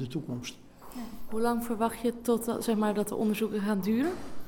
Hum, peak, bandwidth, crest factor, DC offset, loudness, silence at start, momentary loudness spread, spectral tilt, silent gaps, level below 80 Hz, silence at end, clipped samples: none; -14 dBFS; 19 kHz; 16 dB; under 0.1%; -30 LUFS; 0 s; 14 LU; -5.5 dB/octave; none; -56 dBFS; 0 s; under 0.1%